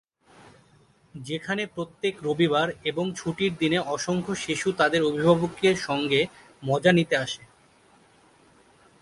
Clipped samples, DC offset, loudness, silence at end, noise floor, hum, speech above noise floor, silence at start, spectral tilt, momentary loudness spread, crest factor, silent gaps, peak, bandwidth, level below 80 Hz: under 0.1%; under 0.1%; -25 LUFS; 1.65 s; -59 dBFS; none; 35 dB; 1.15 s; -5 dB/octave; 11 LU; 22 dB; none; -4 dBFS; 11.5 kHz; -60 dBFS